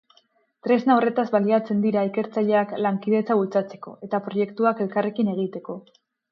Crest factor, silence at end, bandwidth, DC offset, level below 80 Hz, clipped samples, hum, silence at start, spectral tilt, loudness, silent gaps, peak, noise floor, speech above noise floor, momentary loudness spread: 16 dB; 0.5 s; 6 kHz; under 0.1%; -74 dBFS; under 0.1%; none; 0.65 s; -9 dB/octave; -23 LUFS; none; -6 dBFS; -63 dBFS; 40 dB; 12 LU